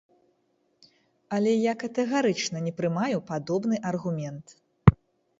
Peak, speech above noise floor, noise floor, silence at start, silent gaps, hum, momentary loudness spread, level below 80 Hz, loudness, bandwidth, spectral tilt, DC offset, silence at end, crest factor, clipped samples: 0 dBFS; 44 dB; -71 dBFS; 1.3 s; none; none; 10 LU; -44 dBFS; -26 LUFS; 8 kHz; -6.5 dB/octave; under 0.1%; 0.45 s; 26 dB; under 0.1%